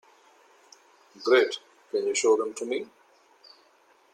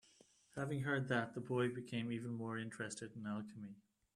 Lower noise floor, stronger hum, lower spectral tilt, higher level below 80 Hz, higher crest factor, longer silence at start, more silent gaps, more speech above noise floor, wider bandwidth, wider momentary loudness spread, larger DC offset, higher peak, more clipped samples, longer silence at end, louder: second, -61 dBFS vs -70 dBFS; neither; second, -1.5 dB/octave vs -6 dB/octave; about the same, -82 dBFS vs -78 dBFS; about the same, 20 dB vs 20 dB; first, 1.2 s vs 0.55 s; neither; first, 37 dB vs 28 dB; second, 11 kHz vs 12.5 kHz; about the same, 13 LU vs 14 LU; neither; first, -10 dBFS vs -24 dBFS; neither; first, 1.3 s vs 0.35 s; first, -26 LUFS vs -43 LUFS